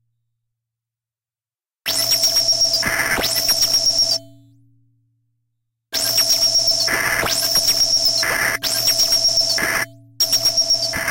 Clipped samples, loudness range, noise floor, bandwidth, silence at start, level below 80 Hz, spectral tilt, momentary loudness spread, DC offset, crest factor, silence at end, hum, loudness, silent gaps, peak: under 0.1%; 4 LU; under -90 dBFS; 17 kHz; 1.85 s; -46 dBFS; 0.5 dB/octave; 7 LU; under 0.1%; 14 dB; 0 s; none; -15 LUFS; none; -6 dBFS